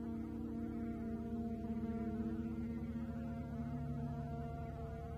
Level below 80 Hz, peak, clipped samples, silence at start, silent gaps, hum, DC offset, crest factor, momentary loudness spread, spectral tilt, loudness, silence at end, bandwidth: -52 dBFS; -30 dBFS; under 0.1%; 0 s; none; none; under 0.1%; 12 dB; 3 LU; -9.5 dB/octave; -44 LUFS; 0 s; 7.2 kHz